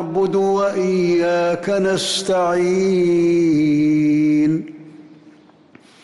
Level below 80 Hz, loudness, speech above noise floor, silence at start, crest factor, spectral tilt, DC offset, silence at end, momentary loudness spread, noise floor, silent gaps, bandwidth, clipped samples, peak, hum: -56 dBFS; -17 LUFS; 31 dB; 0 s; 8 dB; -5.5 dB/octave; under 0.1%; 1 s; 3 LU; -48 dBFS; none; 12 kHz; under 0.1%; -10 dBFS; none